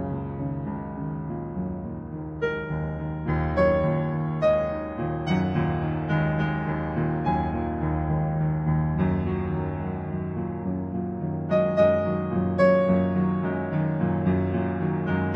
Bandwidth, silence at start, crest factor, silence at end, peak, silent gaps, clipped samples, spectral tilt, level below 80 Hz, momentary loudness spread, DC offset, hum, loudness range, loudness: 6.2 kHz; 0 s; 18 dB; 0 s; -8 dBFS; none; under 0.1%; -10 dB/octave; -42 dBFS; 10 LU; under 0.1%; none; 4 LU; -26 LUFS